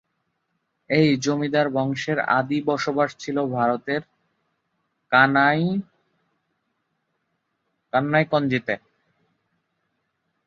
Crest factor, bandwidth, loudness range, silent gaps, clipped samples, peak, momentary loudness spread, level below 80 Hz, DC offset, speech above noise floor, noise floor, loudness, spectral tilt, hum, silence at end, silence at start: 22 dB; 7.6 kHz; 4 LU; none; under 0.1%; -2 dBFS; 9 LU; -66 dBFS; under 0.1%; 54 dB; -75 dBFS; -22 LUFS; -6 dB/octave; none; 1.7 s; 0.9 s